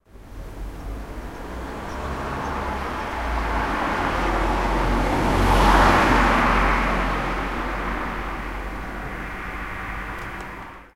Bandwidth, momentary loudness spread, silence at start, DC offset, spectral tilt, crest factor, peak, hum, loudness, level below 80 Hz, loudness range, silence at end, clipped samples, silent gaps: 15.5 kHz; 18 LU; 0.15 s; 0.1%; -5.5 dB/octave; 20 dB; -2 dBFS; none; -23 LUFS; -28 dBFS; 11 LU; 0.1 s; under 0.1%; none